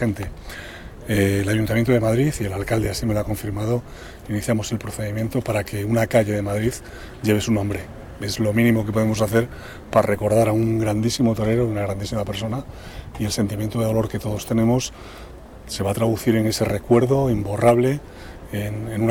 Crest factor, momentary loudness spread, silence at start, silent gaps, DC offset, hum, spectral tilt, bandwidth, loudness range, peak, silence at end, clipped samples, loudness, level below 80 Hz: 16 dB; 17 LU; 0 s; none; under 0.1%; none; -6 dB/octave; 17 kHz; 4 LU; -4 dBFS; 0 s; under 0.1%; -22 LUFS; -40 dBFS